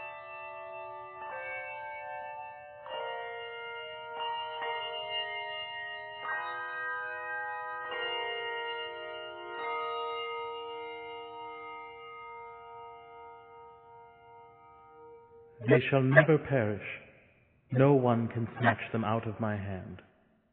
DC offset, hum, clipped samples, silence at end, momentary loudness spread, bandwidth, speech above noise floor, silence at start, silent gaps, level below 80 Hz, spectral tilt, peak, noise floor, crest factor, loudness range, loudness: under 0.1%; none; under 0.1%; 0.5 s; 21 LU; 4.5 kHz; 37 dB; 0 s; none; -72 dBFS; -4.5 dB/octave; -6 dBFS; -64 dBFS; 28 dB; 18 LU; -33 LUFS